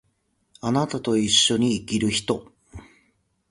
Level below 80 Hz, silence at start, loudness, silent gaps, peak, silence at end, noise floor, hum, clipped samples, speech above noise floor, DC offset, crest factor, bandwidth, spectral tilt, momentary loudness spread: -54 dBFS; 0.65 s; -22 LUFS; none; -6 dBFS; 0.7 s; -70 dBFS; none; under 0.1%; 47 dB; under 0.1%; 20 dB; 11.5 kHz; -3.5 dB/octave; 12 LU